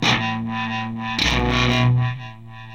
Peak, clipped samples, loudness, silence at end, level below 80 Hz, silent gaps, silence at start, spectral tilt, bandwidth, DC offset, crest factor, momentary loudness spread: -4 dBFS; under 0.1%; -20 LUFS; 0 s; -34 dBFS; none; 0 s; -5 dB/octave; 9.6 kHz; 0.4%; 16 dB; 14 LU